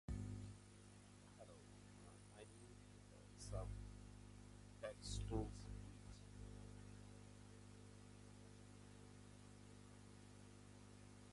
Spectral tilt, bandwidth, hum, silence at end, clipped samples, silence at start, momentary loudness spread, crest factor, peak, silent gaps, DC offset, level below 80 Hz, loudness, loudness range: -5.5 dB/octave; 11.5 kHz; 50 Hz at -60 dBFS; 0 s; under 0.1%; 0.1 s; 12 LU; 24 dB; -32 dBFS; none; under 0.1%; -62 dBFS; -58 LUFS; 9 LU